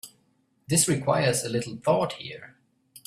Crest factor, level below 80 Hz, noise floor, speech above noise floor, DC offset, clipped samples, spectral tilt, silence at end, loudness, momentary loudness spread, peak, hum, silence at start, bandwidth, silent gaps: 18 dB; -62 dBFS; -68 dBFS; 43 dB; under 0.1%; under 0.1%; -4 dB/octave; 0.1 s; -25 LUFS; 17 LU; -8 dBFS; none; 0.05 s; 15.5 kHz; none